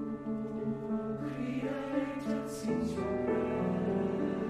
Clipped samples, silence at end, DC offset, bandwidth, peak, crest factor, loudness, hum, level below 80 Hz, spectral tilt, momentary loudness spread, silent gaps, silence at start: under 0.1%; 0 s; under 0.1%; 13.5 kHz; -20 dBFS; 14 dB; -34 LUFS; none; -58 dBFS; -7.5 dB/octave; 5 LU; none; 0 s